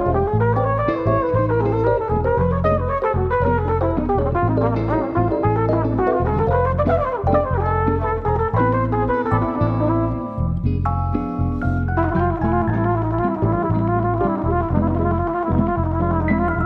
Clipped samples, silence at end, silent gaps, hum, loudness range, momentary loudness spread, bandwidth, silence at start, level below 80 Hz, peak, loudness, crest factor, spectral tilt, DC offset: under 0.1%; 0 s; none; none; 2 LU; 3 LU; 5 kHz; 0 s; -30 dBFS; -4 dBFS; -20 LUFS; 14 dB; -11 dB/octave; under 0.1%